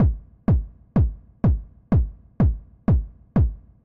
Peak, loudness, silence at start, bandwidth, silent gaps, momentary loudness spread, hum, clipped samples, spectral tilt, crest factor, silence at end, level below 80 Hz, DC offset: -10 dBFS; -24 LUFS; 0 s; 3.1 kHz; none; 5 LU; none; under 0.1%; -12 dB/octave; 12 dB; 0.3 s; -26 dBFS; under 0.1%